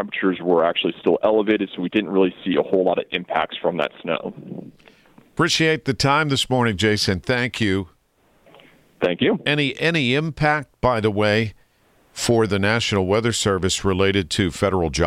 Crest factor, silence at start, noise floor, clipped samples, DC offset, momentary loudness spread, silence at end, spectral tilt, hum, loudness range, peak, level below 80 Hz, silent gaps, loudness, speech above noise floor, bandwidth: 16 dB; 0 s; -60 dBFS; under 0.1%; under 0.1%; 7 LU; 0 s; -4.5 dB/octave; none; 3 LU; -6 dBFS; -46 dBFS; none; -20 LUFS; 40 dB; 15.5 kHz